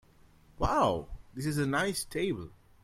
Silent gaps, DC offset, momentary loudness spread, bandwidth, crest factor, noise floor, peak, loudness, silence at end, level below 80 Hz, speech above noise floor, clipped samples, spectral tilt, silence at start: none; under 0.1%; 12 LU; 16 kHz; 18 dB; -60 dBFS; -14 dBFS; -31 LUFS; 0.3 s; -48 dBFS; 29 dB; under 0.1%; -5 dB/octave; 0.6 s